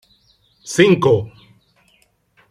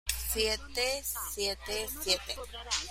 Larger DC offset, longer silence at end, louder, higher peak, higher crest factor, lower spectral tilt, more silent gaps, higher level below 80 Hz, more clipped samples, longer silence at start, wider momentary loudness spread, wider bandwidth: neither; first, 1.25 s vs 0 s; first, -15 LUFS vs -32 LUFS; first, 0 dBFS vs -14 dBFS; about the same, 20 dB vs 20 dB; first, -5.5 dB/octave vs -1 dB/octave; neither; second, -56 dBFS vs -46 dBFS; neither; first, 0.65 s vs 0.05 s; first, 23 LU vs 5 LU; second, 13.5 kHz vs 16.5 kHz